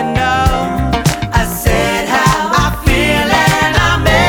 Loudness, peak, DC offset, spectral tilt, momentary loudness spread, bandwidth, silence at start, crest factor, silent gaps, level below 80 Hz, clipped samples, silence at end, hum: -12 LUFS; 0 dBFS; under 0.1%; -4.5 dB/octave; 4 LU; over 20 kHz; 0 s; 12 dB; none; -20 dBFS; under 0.1%; 0 s; none